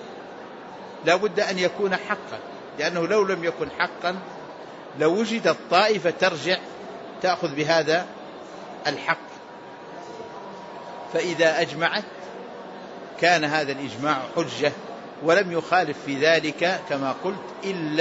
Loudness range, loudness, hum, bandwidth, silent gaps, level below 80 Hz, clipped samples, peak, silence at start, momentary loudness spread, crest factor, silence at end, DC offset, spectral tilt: 4 LU; -23 LUFS; none; 8 kHz; none; -70 dBFS; under 0.1%; -6 dBFS; 0 s; 18 LU; 20 dB; 0 s; under 0.1%; -4 dB/octave